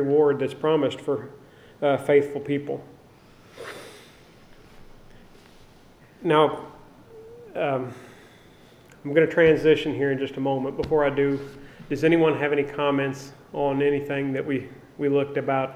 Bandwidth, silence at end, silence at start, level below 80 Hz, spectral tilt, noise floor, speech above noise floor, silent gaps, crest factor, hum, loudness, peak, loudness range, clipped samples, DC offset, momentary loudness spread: 12.5 kHz; 0 s; 0 s; -54 dBFS; -7 dB/octave; -52 dBFS; 29 dB; none; 20 dB; none; -23 LUFS; -4 dBFS; 6 LU; under 0.1%; under 0.1%; 19 LU